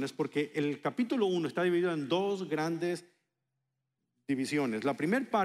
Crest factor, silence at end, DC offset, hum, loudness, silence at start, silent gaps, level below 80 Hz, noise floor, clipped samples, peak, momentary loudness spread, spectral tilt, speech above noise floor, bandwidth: 16 dB; 0 s; under 0.1%; none; -32 LUFS; 0 s; none; -82 dBFS; -85 dBFS; under 0.1%; -16 dBFS; 5 LU; -6 dB/octave; 53 dB; 14 kHz